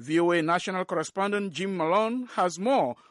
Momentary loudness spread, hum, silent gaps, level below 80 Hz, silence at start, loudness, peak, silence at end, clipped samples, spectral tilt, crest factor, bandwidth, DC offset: 6 LU; none; none; -76 dBFS; 0 s; -27 LUFS; -14 dBFS; 0.15 s; under 0.1%; -5 dB/octave; 14 dB; 11.5 kHz; under 0.1%